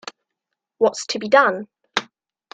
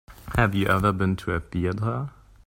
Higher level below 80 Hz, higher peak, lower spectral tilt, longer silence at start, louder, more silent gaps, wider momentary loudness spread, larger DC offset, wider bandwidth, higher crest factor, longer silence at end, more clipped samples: second, -70 dBFS vs -42 dBFS; first, 0 dBFS vs -6 dBFS; second, -2.5 dB/octave vs -7 dB/octave; about the same, 0.05 s vs 0.1 s; first, -20 LUFS vs -25 LUFS; neither; first, 13 LU vs 7 LU; neither; second, 9.4 kHz vs 16.5 kHz; about the same, 22 dB vs 18 dB; first, 0.5 s vs 0.35 s; neither